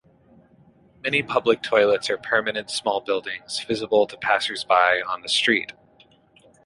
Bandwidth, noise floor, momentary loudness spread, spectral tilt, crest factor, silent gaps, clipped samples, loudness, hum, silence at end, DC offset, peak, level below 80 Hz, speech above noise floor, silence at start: 11.5 kHz; -56 dBFS; 8 LU; -2.5 dB/octave; 20 dB; none; under 0.1%; -22 LUFS; none; 0.95 s; under 0.1%; -4 dBFS; -64 dBFS; 34 dB; 1.05 s